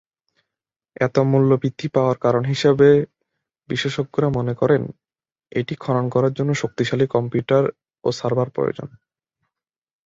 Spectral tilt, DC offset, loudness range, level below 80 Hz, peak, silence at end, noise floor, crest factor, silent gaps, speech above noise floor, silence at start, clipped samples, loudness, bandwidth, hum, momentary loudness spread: -7 dB/octave; under 0.1%; 4 LU; -56 dBFS; -2 dBFS; 1.2 s; under -90 dBFS; 18 dB; none; over 71 dB; 1 s; under 0.1%; -20 LUFS; 7.8 kHz; none; 10 LU